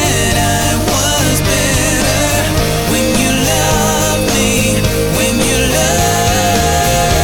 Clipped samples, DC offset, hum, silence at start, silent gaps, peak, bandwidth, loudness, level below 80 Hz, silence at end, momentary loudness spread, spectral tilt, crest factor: under 0.1%; under 0.1%; none; 0 s; none; -2 dBFS; 19.5 kHz; -12 LUFS; -22 dBFS; 0 s; 2 LU; -3.5 dB/octave; 10 dB